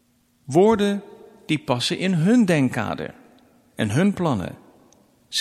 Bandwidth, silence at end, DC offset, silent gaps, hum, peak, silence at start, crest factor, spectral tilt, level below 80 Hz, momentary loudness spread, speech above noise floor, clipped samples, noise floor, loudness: 13.5 kHz; 0 s; under 0.1%; none; none; -4 dBFS; 0.5 s; 18 dB; -6 dB/octave; -56 dBFS; 12 LU; 36 dB; under 0.1%; -56 dBFS; -21 LUFS